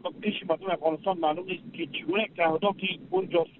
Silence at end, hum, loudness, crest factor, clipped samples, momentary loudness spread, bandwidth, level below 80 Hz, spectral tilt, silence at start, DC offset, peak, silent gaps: 0.1 s; none; -29 LUFS; 18 dB; under 0.1%; 8 LU; 4.2 kHz; -72 dBFS; -3 dB/octave; 0.05 s; under 0.1%; -12 dBFS; none